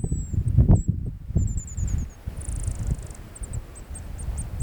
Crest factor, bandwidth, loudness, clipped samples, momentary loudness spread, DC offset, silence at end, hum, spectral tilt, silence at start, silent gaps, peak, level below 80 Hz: 20 dB; 19.5 kHz; -27 LUFS; under 0.1%; 18 LU; under 0.1%; 0 s; none; -7.5 dB/octave; 0 s; none; -6 dBFS; -30 dBFS